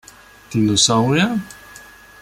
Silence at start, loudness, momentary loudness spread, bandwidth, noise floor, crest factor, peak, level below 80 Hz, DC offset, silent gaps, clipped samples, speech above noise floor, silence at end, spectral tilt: 0.5 s; -17 LUFS; 19 LU; 16 kHz; -42 dBFS; 18 dB; -2 dBFS; -50 dBFS; under 0.1%; none; under 0.1%; 26 dB; 0.45 s; -4 dB/octave